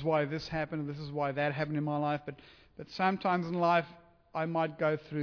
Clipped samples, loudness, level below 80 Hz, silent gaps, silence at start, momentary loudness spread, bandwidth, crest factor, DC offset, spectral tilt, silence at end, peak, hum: under 0.1%; -32 LUFS; -64 dBFS; none; 0 s; 14 LU; 5.4 kHz; 16 dB; under 0.1%; -7.5 dB/octave; 0 s; -16 dBFS; none